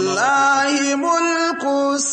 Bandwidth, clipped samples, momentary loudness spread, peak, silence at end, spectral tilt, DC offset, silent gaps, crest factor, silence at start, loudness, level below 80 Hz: 8.8 kHz; under 0.1%; 4 LU; -6 dBFS; 0 s; -2 dB/octave; under 0.1%; none; 12 dB; 0 s; -17 LUFS; -70 dBFS